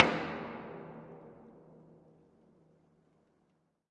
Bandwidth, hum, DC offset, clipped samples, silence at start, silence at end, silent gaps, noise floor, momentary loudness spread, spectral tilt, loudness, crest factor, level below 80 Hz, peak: 9.6 kHz; none; under 0.1%; under 0.1%; 0 s; 2.15 s; none; -75 dBFS; 22 LU; -5.5 dB/octave; -37 LUFS; 36 dB; -74 dBFS; -4 dBFS